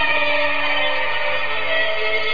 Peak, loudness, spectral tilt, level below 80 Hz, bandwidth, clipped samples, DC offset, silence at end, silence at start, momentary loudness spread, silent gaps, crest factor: -6 dBFS; -19 LUFS; -4 dB/octave; -66 dBFS; 5.2 kHz; under 0.1%; 8%; 0 s; 0 s; 3 LU; none; 12 dB